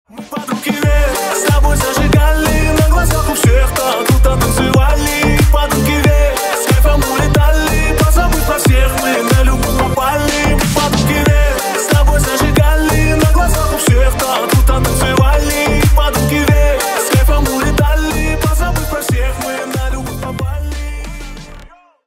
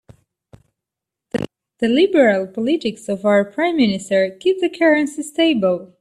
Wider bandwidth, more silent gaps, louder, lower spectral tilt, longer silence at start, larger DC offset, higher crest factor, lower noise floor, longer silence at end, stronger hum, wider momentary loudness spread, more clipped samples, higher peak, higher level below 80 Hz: first, 16.5 kHz vs 12.5 kHz; neither; first, -13 LUFS vs -18 LUFS; about the same, -5 dB/octave vs -5 dB/octave; second, 0.15 s vs 1.35 s; neither; about the same, 12 dB vs 16 dB; second, -38 dBFS vs -85 dBFS; first, 0.4 s vs 0.15 s; neither; about the same, 8 LU vs 10 LU; neither; about the same, 0 dBFS vs -2 dBFS; first, -14 dBFS vs -58 dBFS